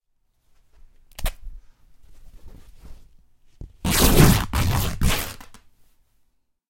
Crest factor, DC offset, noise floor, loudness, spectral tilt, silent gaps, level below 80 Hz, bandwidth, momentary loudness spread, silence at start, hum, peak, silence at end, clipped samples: 24 dB; under 0.1%; -66 dBFS; -21 LUFS; -4.5 dB/octave; none; -30 dBFS; 16.5 kHz; 19 LU; 1.2 s; none; 0 dBFS; 1.3 s; under 0.1%